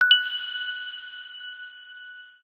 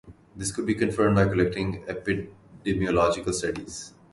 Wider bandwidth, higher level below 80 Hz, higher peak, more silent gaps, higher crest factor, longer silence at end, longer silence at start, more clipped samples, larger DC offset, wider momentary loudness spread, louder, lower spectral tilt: about the same, 12.5 kHz vs 11.5 kHz; second, -86 dBFS vs -46 dBFS; first, -4 dBFS vs -8 dBFS; neither; first, 24 dB vs 18 dB; about the same, 0.15 s vs 0.25 s; about the same, 0 s vs 0.05 s; neither; neither; first, 23 LU vs 13 LU; about the same, -25 LUFS vs -26 LUFS; second, 2 dB/octave vs -5.5 dB/octave